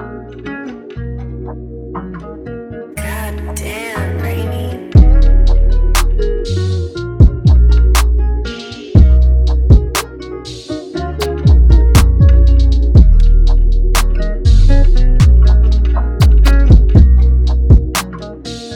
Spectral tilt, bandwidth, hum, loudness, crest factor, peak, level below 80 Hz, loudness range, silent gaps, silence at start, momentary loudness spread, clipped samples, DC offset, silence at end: -6.5 dB/octave; 15.5 kHz; none; -12 LUFS; 10 dB; 0 dBFS; -10 dBFS; 12 LU; none; 0 s; 17 LU; 0.4%; under 0.1%; 0 s